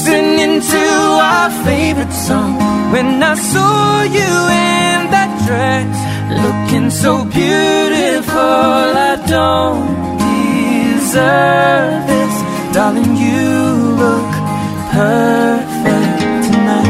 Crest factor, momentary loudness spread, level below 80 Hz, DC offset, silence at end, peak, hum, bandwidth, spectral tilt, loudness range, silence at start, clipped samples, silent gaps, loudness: 12 dB; 5 LU; -38 dBFS; under 0.1%; 0 s; 0 dBFS; none; 16 kHz; -5 dB/octave; 1 LU; 0 s; under 0.1%; none; -12 LUFS